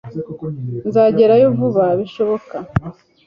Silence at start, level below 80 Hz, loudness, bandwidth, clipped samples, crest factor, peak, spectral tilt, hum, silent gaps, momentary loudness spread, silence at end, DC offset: 0.05 s; -44 dBFS; -16 LUFS; 5.6 kHz; under 0.1%; 14 dB; -2 dBFS; -9.5 dB/octave; none; none; 16 LU; 0.35 s; under 0.1%